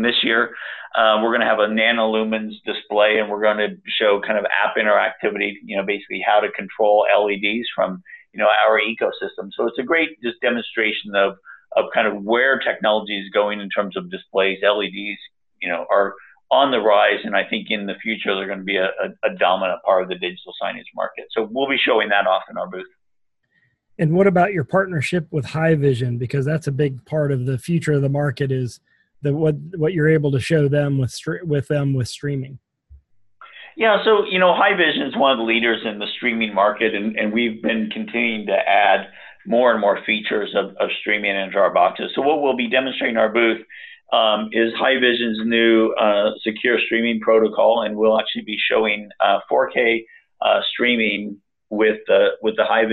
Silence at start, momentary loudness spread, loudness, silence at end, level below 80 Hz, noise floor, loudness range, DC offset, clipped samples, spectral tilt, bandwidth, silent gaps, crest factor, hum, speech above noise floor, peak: 0 s; 9 LU; -19 LUFS; 0 s; -60 dBFS; -73 dBFS; 4 LU; under 0.1%; under 0.1%; -6 dB/octave; 12 kHz; none; 18 dB; none; 54 dB; -2 dBFS